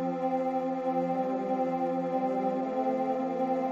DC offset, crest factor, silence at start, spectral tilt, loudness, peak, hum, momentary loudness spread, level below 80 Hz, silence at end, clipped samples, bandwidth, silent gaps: under 0.1%; 12 dB; 0 s; -8.5 dB/octave; -30 LUFS; -18 dBFS; none; 1 LU; -74 dBFS; 0 s; under 0.1%; 7.4 kHz; none